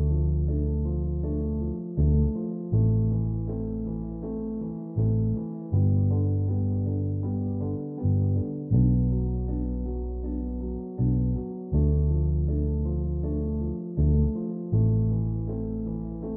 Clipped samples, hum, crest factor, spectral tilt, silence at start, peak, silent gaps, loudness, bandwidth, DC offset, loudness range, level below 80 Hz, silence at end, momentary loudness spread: under 0.1%; none; 14 dB; -15.5 dB/octave; 0 s; -10 dBFS; none; -27 LUFS; 1.4 kHz; under 0.1%; 2 LU; -32 dBFS; 0 s; 9 LU